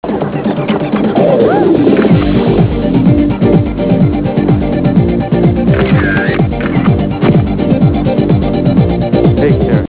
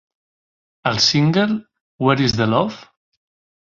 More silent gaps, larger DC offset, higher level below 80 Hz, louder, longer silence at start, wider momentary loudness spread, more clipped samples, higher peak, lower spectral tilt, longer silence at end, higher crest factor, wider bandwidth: second, none vs 1.81-1.99 s; first, 0.4% vs under 0.1%; first, -24 dBFS vs -50 dBFS; first, -10 LUFS vs -18 LUFS; second, 0.05 s vs 0.85 s; second, 4 LU vs 11 LU; first, 0.4% vs under 0.1%; about the same, 0 dBFS vs -2 dBFS; first, -12 dB/octave vs -5 dB/octave; second, 0 s vs 0.8 s; second, 10 dB vs 18 dB; second, 4 kHz vs 7.6 kHz